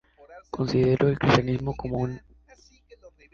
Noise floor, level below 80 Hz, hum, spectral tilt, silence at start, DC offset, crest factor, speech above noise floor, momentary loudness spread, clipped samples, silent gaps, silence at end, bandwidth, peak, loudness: -56 dBFS; -48 dBFS; none; -7 dB/octave; 0.3 s; under 0.1%; 24 dB; 33 dB; 12 LU; under 0.1%; none; 0.25 s; 7.4 kHz; -4 dBFS; -24 LUFS